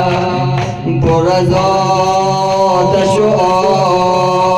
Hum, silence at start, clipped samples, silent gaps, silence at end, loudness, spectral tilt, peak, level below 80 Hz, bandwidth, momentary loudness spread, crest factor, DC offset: none; 0 s; under 0.1%; none; 0 s; -12 LUFS; -6 dB/octave; -2 dBFS; -36 dBFS; 12 kHz; 4 LU; 8 dB; under 0.1%